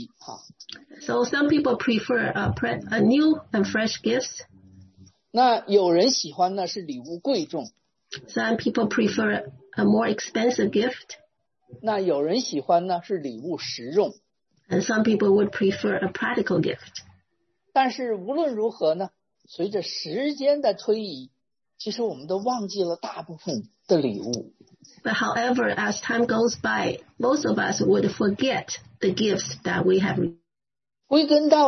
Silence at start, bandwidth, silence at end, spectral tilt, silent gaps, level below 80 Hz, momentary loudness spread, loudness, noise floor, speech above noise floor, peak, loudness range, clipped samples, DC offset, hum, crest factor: 0 s; 6.4 kHz; 0 s; -4.5 dB/octave; none; -62 dBFS; 14 LU; -24 LUFS; under -90 dBFS; over 66 dB; -4 dBFS; 4 LU; under 0.1%; under 0.1%; none; 20 dB